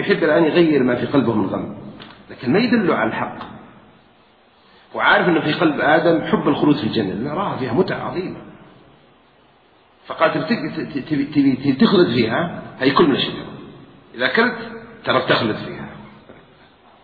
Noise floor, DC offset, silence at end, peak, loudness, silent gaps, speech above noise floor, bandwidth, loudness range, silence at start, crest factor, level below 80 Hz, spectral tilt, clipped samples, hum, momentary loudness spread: -53 dBFS; under 0.1%; 0.7 s; 0 dBFS; -18 LUFS; none; 36 dB; 4.9 kHz; 6 LU; 0 s; 20 dB; -54 dBFS; -9 dB/octave; under 0.1%; none; 18 LU